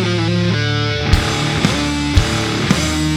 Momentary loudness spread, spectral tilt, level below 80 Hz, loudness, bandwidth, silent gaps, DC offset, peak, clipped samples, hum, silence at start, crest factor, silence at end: 2 LU; -5 dB/octave; -24 dBFS; -16 LUFS; 15 kHz; none; under 0.1%; 0 dBFS; under 0.1%; none; 0 s; 16 dB; 0 s